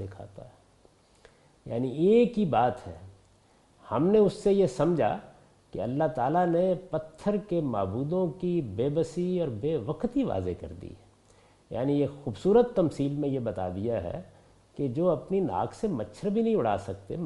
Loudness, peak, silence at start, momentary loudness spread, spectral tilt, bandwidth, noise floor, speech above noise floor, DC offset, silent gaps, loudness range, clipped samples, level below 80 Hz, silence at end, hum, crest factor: -28 LUFS; -12 dBFS; 0 s; 15 LU; -8 dB/octave; 11.5 kHz; -62 dBFS; 34 dB; under 0.1%; none; 4 LU; under 0.1%; -56 dBFS; 0 s; none; 18 dB